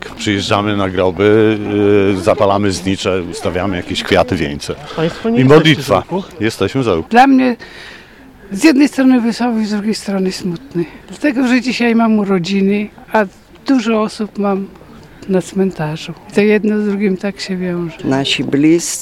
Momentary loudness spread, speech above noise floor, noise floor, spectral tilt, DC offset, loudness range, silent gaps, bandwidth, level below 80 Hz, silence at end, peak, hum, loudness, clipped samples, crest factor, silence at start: 12 LU; 25 dB; -39 dBFS; -5.5 dB/octave; under 0.1%; 4 LU; none; 15 kHz; -44 dBFS; 0 s; 0 dBFS; none; -14 LUFS; 0.2%; 14 dB; 0 s